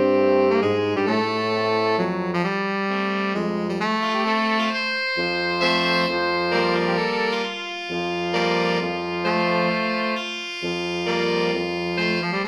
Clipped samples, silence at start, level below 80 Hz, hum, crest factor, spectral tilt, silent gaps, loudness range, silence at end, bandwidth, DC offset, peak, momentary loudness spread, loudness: under 0.1%; 0 s; -62 dBFS; none; 14 dB; -5.5 dB/octave; none; 2 LU; 0 s; 12.5 kHz; under 0.1%; -8 dBFS; 6 LU; -22 LUFS